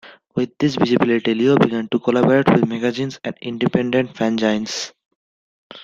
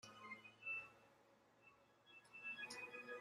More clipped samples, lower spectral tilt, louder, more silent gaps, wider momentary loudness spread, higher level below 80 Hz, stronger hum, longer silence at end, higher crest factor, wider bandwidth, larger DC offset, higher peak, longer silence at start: neither; first, -6 dB/octave vs -2 dB/octave; first, -19 LUFS vs -52 LUFS; first, 5.06-5.70 s vs none; second, 11 LU vs 18 LU; first, -56 dBFS vs under -90 dBFS; neither; about the same, 0 s vs 0 s; about the same, 18 dB vs 16 dB; second, 7.6 kHz vs 13.5 kHz; neither; first, -2 dBFS vs -40 dBFS; about the same, 0.05 s vs 0.05 s